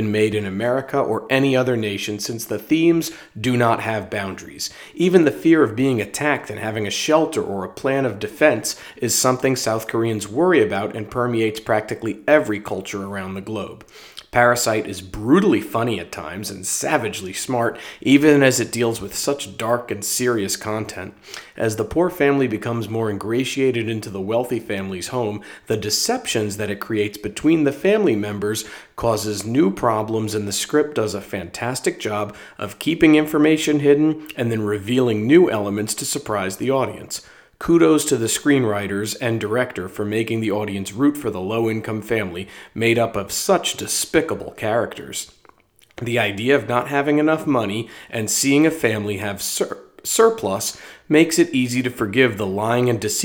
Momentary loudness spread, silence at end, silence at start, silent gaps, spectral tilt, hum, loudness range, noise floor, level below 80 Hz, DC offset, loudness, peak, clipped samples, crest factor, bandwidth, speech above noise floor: 11 LU; 0 s; 0 s; none; -4.5 dB/octave; none; 4 LU; -54 dBFS; -54 dBFS; under 0.1%; -20 LUFS; 0 dBFS; under 0.1%; 20 dB; over 20 kHz; 34 dB